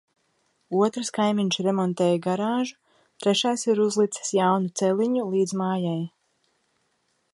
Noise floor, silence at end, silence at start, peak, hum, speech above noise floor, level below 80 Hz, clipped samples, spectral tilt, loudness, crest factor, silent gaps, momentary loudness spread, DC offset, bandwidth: -71 dBFS; 1.25 s; 0.7 s; -8 dBFS; none; 48 dB; -74 dBFS; under 0.1%; -5 dB/octave; -24 LUFS; 18 dB; none; 6 LU; under 0.1%; 11.5 kHz